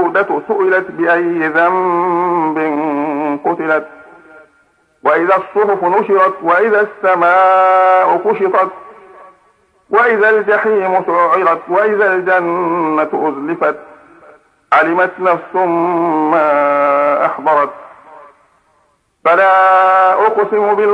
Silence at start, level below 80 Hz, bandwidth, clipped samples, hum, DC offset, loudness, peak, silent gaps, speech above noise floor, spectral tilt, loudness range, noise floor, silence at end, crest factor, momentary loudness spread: 0 s; -66 dBFS; 9.8 kHz; under 0.1%; none; under 0.1%; -12 LUFS; 0 dBFS; none; 46 dB; -7 dB/octave; 4 LU; -58 dBFS; 0 s; 14 dB; 7 LU